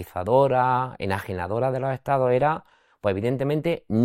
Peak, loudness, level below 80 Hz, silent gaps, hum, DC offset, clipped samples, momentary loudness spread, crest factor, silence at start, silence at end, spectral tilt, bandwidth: -6 dBFS; -24 LUFS; -58 dBFS; none; none; under 0.1%; under 0.1%; 8 LU; 18 dB; 0 s; 0 s; -8 dB/octave; 16 kHz